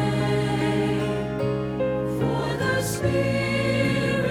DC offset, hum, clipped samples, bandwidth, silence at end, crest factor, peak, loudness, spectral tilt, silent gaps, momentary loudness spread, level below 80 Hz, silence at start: under 0.1%; none; under 0.1%; 16.5 kHz; 0 s; 14 dB; -10 dBFS; -24 LUFS; -6 dB/octave; none; 4 LU; -44 dBFS; 0 s